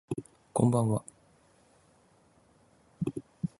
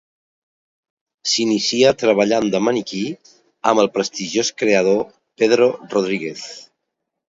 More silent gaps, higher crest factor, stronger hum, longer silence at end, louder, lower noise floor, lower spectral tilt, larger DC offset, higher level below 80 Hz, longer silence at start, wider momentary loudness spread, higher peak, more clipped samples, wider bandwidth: neither; about the same, 24 dB vs 20 dB; neither; second, 0.15 s vs 0.65 s; second, -31 LUFS vs -18 LUFS; second, -64 dBFS vs -78 dBFS; first, -8 dB/octave vs -3.5 dB/octave; neither; about the same, -62 dBFS vs -62 dBFS; second, 0.1 s vs 1.25 s; about the same, 14 LU vs 13 LU; second, -10 dBFS vs 0 dBFS; neither; first, 11.5 kHz vs 7.8 kHz